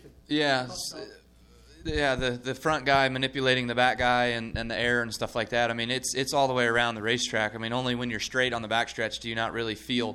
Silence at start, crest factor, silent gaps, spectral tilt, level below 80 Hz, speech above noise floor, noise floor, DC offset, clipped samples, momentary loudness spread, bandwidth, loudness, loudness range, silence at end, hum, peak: 0.05 s; 20 dB; none; -3.5 dB/octave; -48 dBFS; 28 dB; -55 dBFS; under 0.1%; under 0.1%; 8 LU; 16 kHz; -27 LUFS; 2 LU; 0 s; none; -8 dBFS